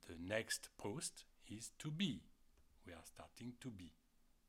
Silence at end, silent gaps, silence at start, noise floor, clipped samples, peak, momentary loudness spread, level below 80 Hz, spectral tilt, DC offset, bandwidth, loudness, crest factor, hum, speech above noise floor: 0.55 s; none; 0 s; -70 dBFS; under 0.1%; -28 dBFS; 17 LU; -74 dBFS; -3.5 dB/octave; under 0.1%; 16.5 kHz; -47 LUFS; 22 dB; none; 22 dB